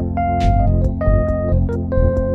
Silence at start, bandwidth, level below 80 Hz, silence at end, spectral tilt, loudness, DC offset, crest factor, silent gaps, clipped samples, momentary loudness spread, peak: 0 s; 6.6 kHz; -20 dBFS; 0 s; -9.5 dB/octave; -18 LUFS; under 0.1%; 12 dB; none; under 0.1%; 3 LU; -2 dBFS